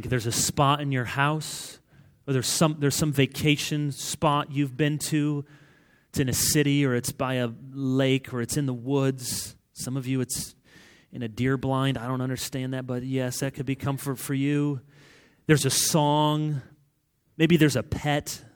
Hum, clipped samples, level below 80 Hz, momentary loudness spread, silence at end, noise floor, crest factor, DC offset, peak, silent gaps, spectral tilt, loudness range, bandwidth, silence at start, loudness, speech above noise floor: none; under 0.1%; -54 dBFS; 11 LU; 0.1 s; -69 dBFS; 20 dB; under 0.1%; -6 dBFS; none; -4.5 dB/octave; 5 LU; over 20 kHz; 0 s; -26 LUFS; 44 dB